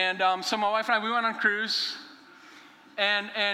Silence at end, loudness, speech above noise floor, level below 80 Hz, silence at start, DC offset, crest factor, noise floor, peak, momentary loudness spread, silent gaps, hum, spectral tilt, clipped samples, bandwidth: 0 s; -26 LUFS; 25 dB; -84 dBFS; 0 s; under 0.1%; 18 dB; -52 dBFS; -10 dBFS; 6 LU; none; none; -2 dB/octave; under 0.1%; 16 kHz